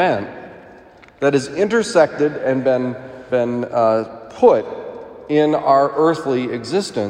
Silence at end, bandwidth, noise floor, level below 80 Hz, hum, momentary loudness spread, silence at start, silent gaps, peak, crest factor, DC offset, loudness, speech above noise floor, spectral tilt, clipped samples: 0 s; 11 kHz; -44 dBFS; -58 dBFS; none; 17 LU; 0 s; none; 0 dBFS; 18 dB; under 0.1%; -17 LUFS; 27 dB; -5.5 dB/octave; under 0.1%